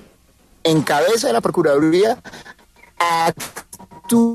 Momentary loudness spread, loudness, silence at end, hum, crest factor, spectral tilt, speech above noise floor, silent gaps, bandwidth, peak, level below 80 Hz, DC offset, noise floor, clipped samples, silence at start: 19 LU; -17 LUFS; 0 s; none; 14 dB; -4.5 dB/octave; 36 dB; none; 13.5 kHz; -4 dBFS; -56 dBFS; under 0.1%; -53 dBFS; under 0.1%; 0.65 s